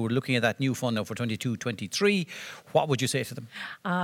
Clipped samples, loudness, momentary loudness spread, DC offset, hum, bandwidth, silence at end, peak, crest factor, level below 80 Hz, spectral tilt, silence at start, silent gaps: under 0.1%; -28 LUFS; 12 LU; under 0.1%; none; 17.5 kHz; 0 s; -10 dBFS; 18 dB; -72 dBFS; -5 dB/octave; 0 s; none